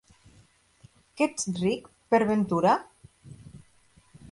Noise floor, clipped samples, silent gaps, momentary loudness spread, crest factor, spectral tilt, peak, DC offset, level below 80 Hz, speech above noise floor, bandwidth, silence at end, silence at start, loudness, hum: -61 dBFS; under 0.1%; none; 12 LU; 18 dB; -5.5 dB/octave; -10 dBFS; under 0.1%; -62 dBFS; 36 dB; 11.5 kHz; 0.05 s; 1.15 s; -26 LUFS; none